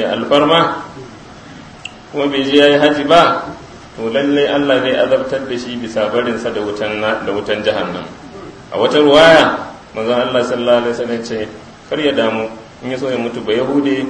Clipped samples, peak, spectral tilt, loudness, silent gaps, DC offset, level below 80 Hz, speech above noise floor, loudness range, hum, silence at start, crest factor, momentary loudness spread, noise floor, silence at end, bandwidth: 0.1%; 0 dBFS; -5 dB/octave; -14 LUFS; none; under 0.1%; -48 dBFS; 21 dB; 5 LU; none; 0 s; 14 dB; 19 LU; -35 dBFS; 0 s; 10.5 kHz